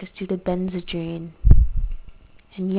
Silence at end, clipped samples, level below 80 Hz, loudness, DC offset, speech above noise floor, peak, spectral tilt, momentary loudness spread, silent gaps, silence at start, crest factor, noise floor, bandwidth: 0 s; under 0.1%; -22 dBFS; -24 LUFS; under 0.1%; 17 dB; 0 dBFS; -11.5 dB/octave; 16 LU; none; 0 s; 20 dB; -44 dBFS; 4 kHz